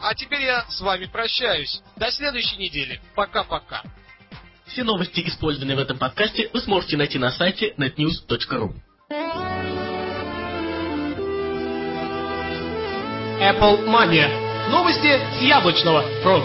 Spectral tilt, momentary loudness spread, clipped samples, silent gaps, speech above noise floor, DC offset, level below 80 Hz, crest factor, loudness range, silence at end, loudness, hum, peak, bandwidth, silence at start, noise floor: -8.5 dB/octave; 11 LU; under 0.1%; none; 24 dB; under 0.1%; -44 dBFS; 18 dB; 9 LU; 0 s; -21 LUFS; none; -4 dBFS; 5.8 kHz; 0 s; -45 dBFS